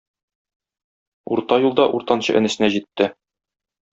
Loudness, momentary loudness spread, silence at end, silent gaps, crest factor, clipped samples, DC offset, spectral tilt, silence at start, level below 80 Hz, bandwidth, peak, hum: -19 LUFS; 6 LU; 0.8 s; none; 20 dB; under 0.1%; under 0.1%; -5 dB/octave; 1.3 s; -62 dBFS; 8 kHz; -2 dBFS; none